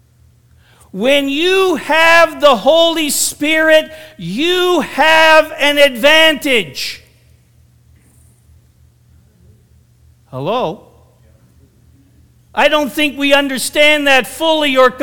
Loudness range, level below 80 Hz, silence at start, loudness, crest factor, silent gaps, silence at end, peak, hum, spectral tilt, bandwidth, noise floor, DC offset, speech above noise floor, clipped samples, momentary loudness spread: 16 LU; -48 dBFS; 0 s; -11 LUFS; 14 dB; none; 0 s; 0 dBFS; none; -2.5 dB/octave; 19.5 kHz; -49 dBFS; under 0.1%; 37 dB; 0.2%; 15 LU